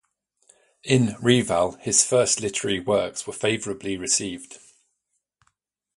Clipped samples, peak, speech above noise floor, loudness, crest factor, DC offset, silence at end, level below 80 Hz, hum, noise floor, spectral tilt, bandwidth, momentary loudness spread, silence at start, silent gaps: under 0.1%; -4 dBFS; 54 dB; -22 LUFS; 22 dB; under 0.1%; 1.4 s; -56 dBFS; none; -77 dBFS; -3.5 dB/octave; 11.5 kHz; 11 LU; 0.85 s; none